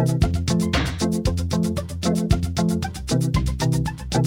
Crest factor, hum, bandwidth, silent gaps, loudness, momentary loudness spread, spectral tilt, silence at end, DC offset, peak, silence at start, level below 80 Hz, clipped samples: 18 dB; none; 17 kHz; none; -23 LUFS; 3 LU; -6 dB/octave; 0 s; under 0.1%; -4 dBFS; 0 s; -30 dBFS; under 0.1%